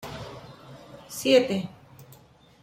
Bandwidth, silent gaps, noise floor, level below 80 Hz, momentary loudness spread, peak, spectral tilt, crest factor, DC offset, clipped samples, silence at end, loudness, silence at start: 16 kHz; none; -54 dBFS; -60 dBFS; 25 LU; -8 dBFS; -4.5 dB/octave; 22 dB; under 0.1%; under 0.1%; 0.6 s; -23 LUFS; 0 s